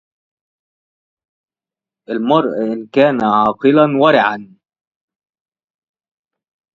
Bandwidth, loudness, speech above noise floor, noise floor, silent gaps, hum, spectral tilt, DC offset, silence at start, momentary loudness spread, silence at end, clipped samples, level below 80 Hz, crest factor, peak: 7.2 kHz; -14 LUFS; 76 dB; -90 dBFS; none; none; -7.5 dB/octave; under 0.1%; 2.1 s; 10 LU; 2.3 s; under 0.1%; -60 dBFS; 18 dB; 0 dBFS